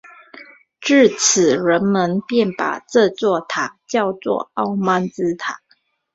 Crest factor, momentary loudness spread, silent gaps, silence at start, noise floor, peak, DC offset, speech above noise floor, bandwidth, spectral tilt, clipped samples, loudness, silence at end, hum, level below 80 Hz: 18 dB; 10 LU; none; 0.05 s; -61 dBFS; -2 dBFS; under 0.1%; 43 dB; 8.2 kHz; -4 dB/octave; under 0.1%; -18 LUFS; 0.6 s; none; -62 dBFS